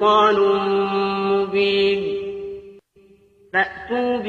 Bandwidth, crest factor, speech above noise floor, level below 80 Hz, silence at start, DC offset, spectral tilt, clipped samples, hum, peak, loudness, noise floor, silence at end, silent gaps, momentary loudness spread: 7 kHz; 14 dB; 35 dB; -56 dBFS; 0 s; under 0.1%; -6 dB/octave; under 0.1%; none; -6 dBFS; -19 LUFS; -53 dBFS; 0 s; none; 14 LU